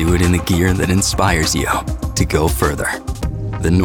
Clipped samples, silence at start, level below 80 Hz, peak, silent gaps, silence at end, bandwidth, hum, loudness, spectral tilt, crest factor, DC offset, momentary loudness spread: under 0.1%; 0 s; -24 dBFS; -4 dBFS; none; 0 s; 20 kHz; none; -17 LUFS; -5 dB/octave; 12 dB; under 0.1%; 8 LU